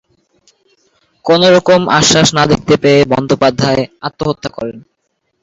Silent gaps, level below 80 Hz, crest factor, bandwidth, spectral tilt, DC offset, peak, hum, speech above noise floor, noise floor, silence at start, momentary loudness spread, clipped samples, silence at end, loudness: none; -42 dBFS; 12 dB; 8 kHz; -4 dB/octave; under 0.1%; 0 dBFS; none; 56 dB; -66 dBFS; 1.25 s; 14 LU; under 0.1%; 0.65 s; -11 LUFS